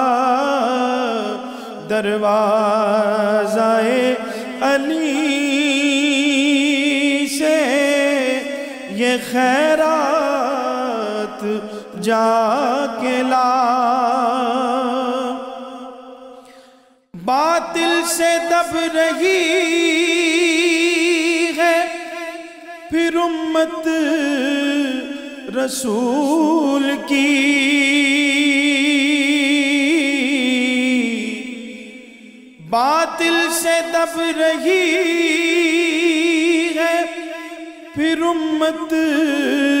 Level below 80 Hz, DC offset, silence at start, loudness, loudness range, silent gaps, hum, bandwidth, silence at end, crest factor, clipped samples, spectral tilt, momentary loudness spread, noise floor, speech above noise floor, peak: -62 dBFS; under 0.1%; 0 s; -17 LUFS; 4 LU; none; none; 16 kHz; 0 s; 12 dB; under 0.1%; -2.5 dB/octave; 11 LU; -50 dBFS; 34 dB; -6 dBFS